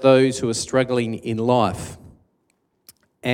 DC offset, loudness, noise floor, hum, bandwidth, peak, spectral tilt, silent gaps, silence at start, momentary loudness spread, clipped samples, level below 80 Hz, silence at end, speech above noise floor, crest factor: under 0.1%; -21 LUFS; -68 dBFS; none; 15.5 kHz; -2 dBFS; -5.5 dB/octave; none; 0 s; 13 LU; under 0.1%; -54 dBFS; 0 s; 49 dB; 18 dB